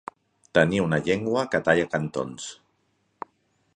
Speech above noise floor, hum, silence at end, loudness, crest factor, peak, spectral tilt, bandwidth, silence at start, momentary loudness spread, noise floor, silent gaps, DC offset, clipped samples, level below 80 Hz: 46 dB; none; 1.25 s; -24 LUFS; 24 dB; -2 dBFS; -5.5 dB/octave; 10 kHz; 0.55 s; 21 LU; -70 dBFS; none; under 0.1%; under 0.1%; -56 dBFS